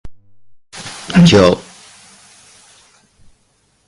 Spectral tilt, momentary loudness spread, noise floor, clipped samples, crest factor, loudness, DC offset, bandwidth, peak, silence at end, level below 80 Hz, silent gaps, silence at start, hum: -6 dB/octave; 23 LU; -59 dBFS; under 0.1%; 16 dB; -11 LUFS; under 0.1%; 11.5 kHz; 0 dBFS; 2.25 s; -40 dBFS; none; 0.05 s; none